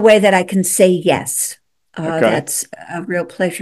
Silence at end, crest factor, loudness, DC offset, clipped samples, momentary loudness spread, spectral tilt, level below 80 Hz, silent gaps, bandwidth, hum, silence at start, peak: 0 s; 16 dB; -16 LUFS; under 0.1%; under 0.1%; 13 LU; -4 dB/octave; -58 dBFS; none; 13 kHz; none; 0 s; 0 dBFS